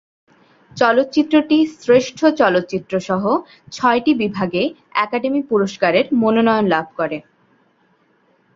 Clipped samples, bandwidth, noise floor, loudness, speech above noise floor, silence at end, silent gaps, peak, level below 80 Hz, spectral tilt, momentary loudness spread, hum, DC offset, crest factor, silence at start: under 0.1%; 7.6 kHz; -59 dBFS; -17 LUFS; 42 dB; 1.35 s; none; -2 dBFS; -60 dBFS; -5.5 dB/octave; 8 LU; none; under 0.1%; 16 dB; 0.75 s